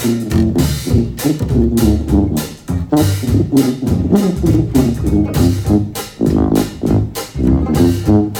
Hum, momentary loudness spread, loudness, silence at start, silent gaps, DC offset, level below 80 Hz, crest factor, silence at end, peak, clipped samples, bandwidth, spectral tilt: none; 5 LU; -15 LUFS; 0 s; none; under 0.1%; -24 dBFS; 14 dB; 0 s; 0 dBFS; under 0.1%; 19 kHz; -7 dB/octave